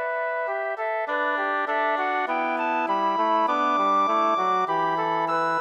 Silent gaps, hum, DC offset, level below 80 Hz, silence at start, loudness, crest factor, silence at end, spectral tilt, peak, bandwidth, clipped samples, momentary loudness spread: none; none; under 0.1%; -84 dBFS; 0 s; -24 LUFS; 12 dB; 0 s; -5 dB/octave; -12 dBFS; 8.4 kHz; under 0.1%; 6 LU